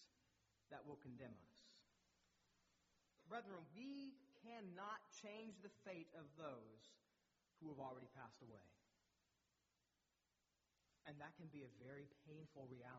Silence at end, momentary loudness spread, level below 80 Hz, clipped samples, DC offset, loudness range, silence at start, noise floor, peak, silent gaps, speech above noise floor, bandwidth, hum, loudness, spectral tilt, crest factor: 0 s; 9 LU; under -90 dBFS; under 0.1%; under 0.1%; 8 LU; 0 s; -90 dBFS; -40 dBFS; none; 31 dB; 7.4 kHz; none; -59 LUFS; -4.5 dB/octave; 22 dB